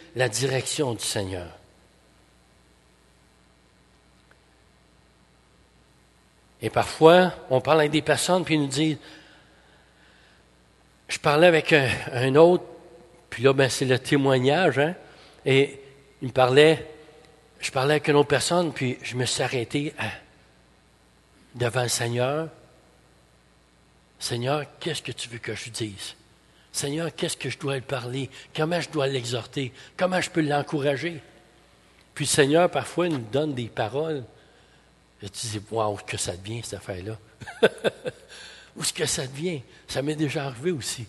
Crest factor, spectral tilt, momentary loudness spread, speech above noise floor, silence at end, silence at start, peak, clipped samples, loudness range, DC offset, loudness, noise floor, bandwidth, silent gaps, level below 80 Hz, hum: 24 dB; -4.5 dB/octave; 16 LU; 35 dB; 0 s; 0.15 s; -2 dBFS; under 0.1%; 10 LU; under 0.1%; -24 LUFS; -59 dBFS; 12.5 kHz; none; -58 dBFS; none